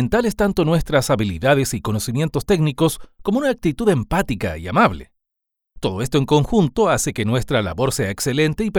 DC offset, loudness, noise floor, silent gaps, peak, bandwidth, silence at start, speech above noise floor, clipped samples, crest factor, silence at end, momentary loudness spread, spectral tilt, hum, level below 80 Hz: under 0.1%; -19 LUFS; -79 dBFS; none; 0 dBFS; over 20 kHz; 0 s; 60 dB; under 0.1%; 18 dB; 0 s; 6 LU; -5.5 dB/octave; none; -38 dBFS